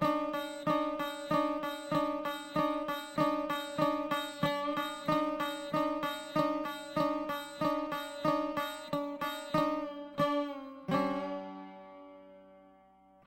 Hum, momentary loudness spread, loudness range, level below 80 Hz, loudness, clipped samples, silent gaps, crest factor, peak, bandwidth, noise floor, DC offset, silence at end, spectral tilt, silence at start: none; 7 LU; 2 LU; -64 dBFS; -34 LUFS; under 0.1%; none; 20 dB; -16 dBFS; 16.5 kHz; -62 dBFS; under 0.1%; 0.55 s; -5.5 dB/octave; 0 s